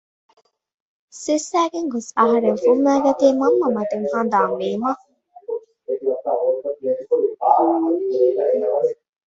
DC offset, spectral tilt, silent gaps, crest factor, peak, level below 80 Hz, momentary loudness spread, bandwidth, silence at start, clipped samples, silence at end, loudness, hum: under 0.1%; -5 dB/octave; none; 18 dB; -2 dBFS; -66 dBFS; 10 LU; 8 kHz; 1.15 s; under 0.1%; 0.35 s; -19 LUFS; none